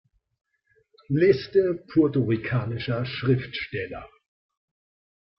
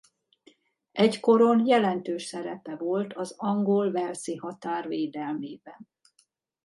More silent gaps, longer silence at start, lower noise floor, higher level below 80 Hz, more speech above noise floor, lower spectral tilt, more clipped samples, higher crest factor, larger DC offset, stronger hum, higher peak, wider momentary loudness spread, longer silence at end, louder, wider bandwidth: neither; first, 1.1 s vs 0.95 s; about the same, -66 dBFS vs -69 dBFS; first, -58 dBFS vs -78 dBFS; about the same, 42 dB vs 43 dB; first, -9.5 dB/octave vs -6 dB/octave; neither; about the same, 18 dB vs 18 dB; neither; neither; about the same, -8 dBFS vs -8 dBFS; second, 11 LU vs 15 LU; first, 1.35 s vs 0.8 s; about the same, -24 LUFS vs -26 LUFS; second, 6 kHz vs 11.5 kHz